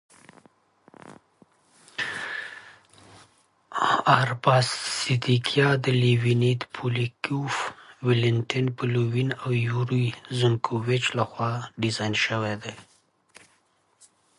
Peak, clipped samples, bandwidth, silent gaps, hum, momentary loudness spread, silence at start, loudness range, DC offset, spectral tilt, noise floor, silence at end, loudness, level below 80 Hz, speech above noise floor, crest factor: -2 dBFS; under 0.1%; 11.5 kHz; none; none; 10 LU; 1.05 s; 8 LU; under 0.1%; -5.5 dB/octave; -66 dBFS; 1.55 s; -25 LUFS; -64 dBFS; 42 dB; 24 dB